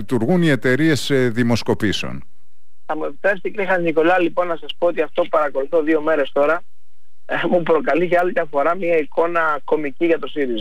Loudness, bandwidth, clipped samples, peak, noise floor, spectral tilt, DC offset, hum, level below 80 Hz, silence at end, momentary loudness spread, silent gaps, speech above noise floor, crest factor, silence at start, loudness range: -19 LUFS; 15.5 kHz; under 0.1%; -6 dBFS; -68 dBFS; -6 dB/octave; 5%; none; -54 dBFS; 0 s; 7 LU; none; 49 dB; 14 dB; 0 s; 2 LU